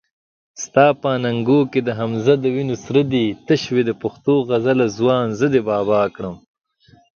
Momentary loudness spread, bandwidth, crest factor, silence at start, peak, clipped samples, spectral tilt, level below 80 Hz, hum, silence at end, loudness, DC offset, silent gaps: 7 LU; 7 kHz; 18 dB; 0.55 s; 0 dBFS; under 0.1%; -6.5 dB/octave; -56 dBFS; none; 0.85 s; -18 LUFS; under 0.1%; none